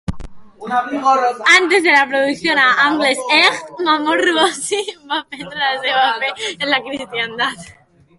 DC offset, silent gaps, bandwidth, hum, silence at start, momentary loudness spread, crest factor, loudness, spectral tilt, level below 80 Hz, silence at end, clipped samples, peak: under 0.1%; none; 11.5 kHz; none; 0.1 s; 12 LU; 16 dB; -15 LUFS; -2.5 dB/octave; -46 dBFS; 0.45 s; under 0.1%; 0 dBFS